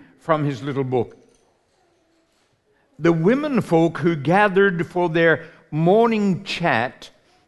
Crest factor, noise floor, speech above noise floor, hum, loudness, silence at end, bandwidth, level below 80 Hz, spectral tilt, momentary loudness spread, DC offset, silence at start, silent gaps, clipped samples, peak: 18 dB; -64 dBFS; 45 dB; none; -20 LUFS; 0.4 s; 12 kHz; -60 dBFS; -7 dB/octave; 8 LU; under 0.1%; 0.25 s; none; under 0.1%; -4 dBFS